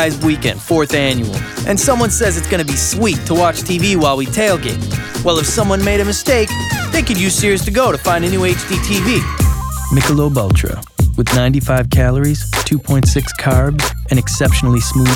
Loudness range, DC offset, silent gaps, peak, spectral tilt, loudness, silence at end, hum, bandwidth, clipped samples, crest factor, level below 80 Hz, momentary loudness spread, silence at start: 1 LU; under 0.1%; none; -2 dBFS; -4.5 dB/octave; -14 LUFS; 0 s; none; 18.5 kHz; under 0.1%; 12 dB; -24 dBFS; 4 LU; 0 s